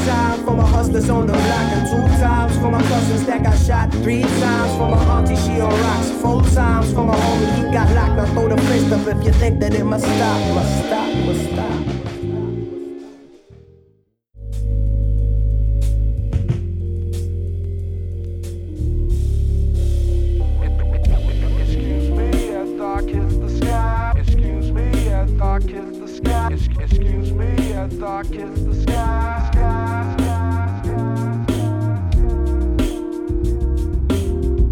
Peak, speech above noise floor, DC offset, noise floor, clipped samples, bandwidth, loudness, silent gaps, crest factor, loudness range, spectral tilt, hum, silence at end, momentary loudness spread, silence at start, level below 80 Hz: -2 dBFS; 43 dB; under 0.1%; -58 dBFS; under 0.1%; 15 kHz; -19 LUFS; none; 14 dB; 7 LU; -7 dB/octave; none; 0 s; 9 LU; 0 s; -20 dBFS